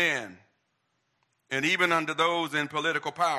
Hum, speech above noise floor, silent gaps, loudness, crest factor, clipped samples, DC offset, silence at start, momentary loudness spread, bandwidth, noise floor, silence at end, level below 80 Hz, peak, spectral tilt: none; 48 dB; none; -27 LUFS; 20 dB; under 0.1%; under 0.1%; 0 s; 9 LU; 16 kHz; -76 dBFS; 0 s; -78 dBFS; -8 dBFS; -3 dB/octave